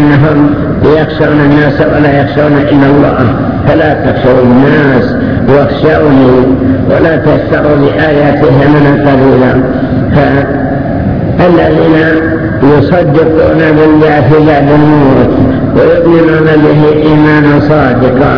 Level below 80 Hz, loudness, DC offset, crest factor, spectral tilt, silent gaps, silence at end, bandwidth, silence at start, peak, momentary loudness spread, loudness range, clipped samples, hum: -26 dBFS; -6 LUFS; under 0.1%; 6 dB; -9.5 dB/octave; none; 0 s; 5.4 kHz; 0 s; 0 dBFS; 4 LU; 2 LU; 6%; none